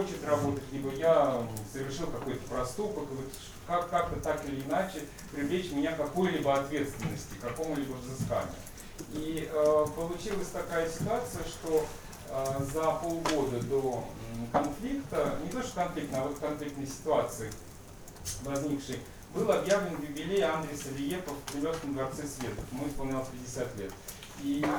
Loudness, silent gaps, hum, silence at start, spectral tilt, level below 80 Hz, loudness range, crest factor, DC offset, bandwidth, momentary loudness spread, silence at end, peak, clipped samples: -33 LUFS; none; none; 0 s; -5 dB/octave; -50 dBFS; 3 LU; 20 dB; under 0.1%; over 20 kHz; 11 LU; 0 s; -14 dBFS; under 0.1%